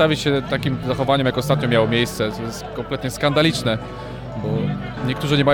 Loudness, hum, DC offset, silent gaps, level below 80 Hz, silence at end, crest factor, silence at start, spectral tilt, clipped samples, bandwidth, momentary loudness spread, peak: -21 LUFS; none; under 0.1%; none; -42 dBFS; 0 s; 14 dB; 0 s; -5.5 dB/octave; under 0.1%; 18.5 kHz; 11 LU; -6 dBFS